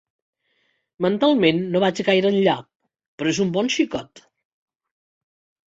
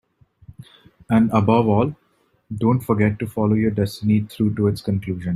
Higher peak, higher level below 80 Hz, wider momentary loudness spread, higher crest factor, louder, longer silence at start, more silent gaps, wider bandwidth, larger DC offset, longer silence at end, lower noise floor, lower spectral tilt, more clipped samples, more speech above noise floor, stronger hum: about the same, -4 dBFS vs -2 dBFS; second, -62 dBFS vs -50 dBFS; about the same, 8 LU vs 8 LU; about the same, 20 dB vs 18 dB; about the same, -20 LUFS vs -20 LUFS; first, 1 s vs 0.6 s; first, 2.76-2.80 s, 3.08-3.18 s vs none; second, 8 kHz vs 14 kHz; neither; first, 1.6 s vs 0 s; first, -68 dBFS vs -47 dBFS; second, -5 dB/octave vs -8.5 dB/octave; neither; first, 49 dB vs 29 dB; neither